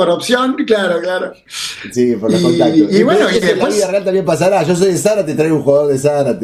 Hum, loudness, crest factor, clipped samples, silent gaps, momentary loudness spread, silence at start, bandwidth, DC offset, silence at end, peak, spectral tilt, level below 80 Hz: none; -13 LUFS; 12 dB; under 0.1%; none; 9 LU; 0 s; 15 kHz; under 0.1%; 0 s; 0 dBFS; -5 dB/octave; -52 dBFS